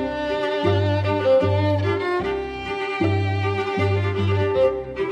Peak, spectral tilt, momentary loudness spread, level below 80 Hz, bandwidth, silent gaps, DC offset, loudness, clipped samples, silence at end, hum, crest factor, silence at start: -8 dBFS; -7.5 dB/octave; 8 LU; -48 dBFS; 7.6 kHz; none; under 0.1%; -22 LUFS; under 0.1%; 0 s; none; 14 dB; 0 s